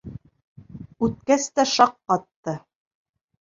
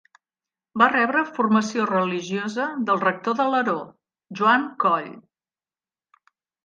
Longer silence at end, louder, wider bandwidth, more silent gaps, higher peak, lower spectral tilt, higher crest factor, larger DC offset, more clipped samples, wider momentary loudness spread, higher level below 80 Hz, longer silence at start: second, 0.8 s vs 1.45 s; about the same, -22 LUFS vs -22 LUFS; about the same, 7.8 kHz vs 7.6 kHz; first, 0.44-0.56 s, 2.36-2.43 s vs none; about the same, -2 dBFS vs -4 dBFS; about the same, -4 dB/octave vs -5 dB/octave; about the same, 22 dB vs 20 dB; neither; neither; first, 22 LU vs 10 LU; first, -54 dBFS vs -74 dBFS; second, 0.05 s vs 0.75 s